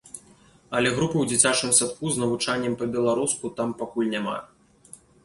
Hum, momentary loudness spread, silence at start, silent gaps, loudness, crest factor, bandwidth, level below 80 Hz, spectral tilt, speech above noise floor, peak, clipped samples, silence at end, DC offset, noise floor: none; 11 LU; 0.05 s; none; -23 LUFS; 22 dB; 11.5 kHz; -60 dBFS; -3 dB/octave; 31 dB; -4 dBFS; under 0.1%; 0.8 s; under 0.1%; -55 dBFS